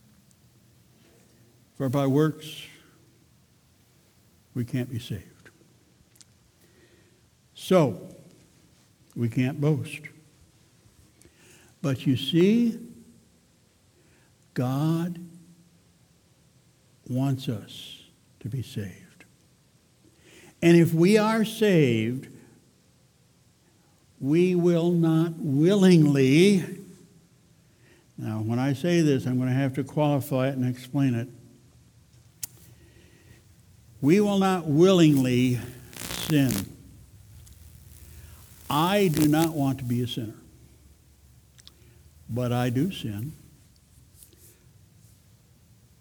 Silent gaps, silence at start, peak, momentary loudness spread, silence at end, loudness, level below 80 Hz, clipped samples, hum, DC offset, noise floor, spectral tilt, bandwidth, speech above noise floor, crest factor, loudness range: none; 1.8 s; -6 dBFS; 21 LU; 2.65 s; -24 LUFS; -60 dBFS; under 0.1%; none; under 0.1%; -62 dBFS; -6.5 dB/octave; over 20 kHz; 39 dB; 22 dB; 12 LU